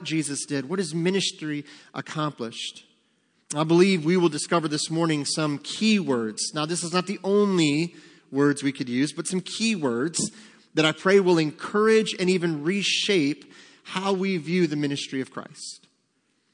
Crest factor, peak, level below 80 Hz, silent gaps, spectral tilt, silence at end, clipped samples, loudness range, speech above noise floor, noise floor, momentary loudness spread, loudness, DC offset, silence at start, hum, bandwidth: 18 dB; -6 dBFS; -76 dBFS; none; -4.5 dB/octave; 0.75 s; under 0.1%; 5 LU; 46 dB; -70 dBFS; 12 LU; -24 LUFS; under 0.1%; 0 s; none; 10.5 kHz